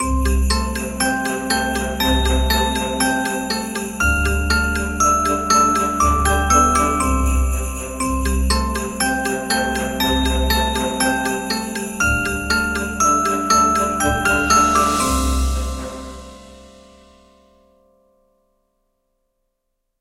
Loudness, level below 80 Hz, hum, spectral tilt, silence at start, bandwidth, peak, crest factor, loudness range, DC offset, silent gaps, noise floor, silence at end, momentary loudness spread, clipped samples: -18 LUFS; -26 dBFS; none; -3.5 dB/octave; 0 s; 16 kHz; -2 dBFS; 16 dB; 4 LU; under 0.1%; none; -74 dBFS; 3.35 s; 8 LU; under 0.1%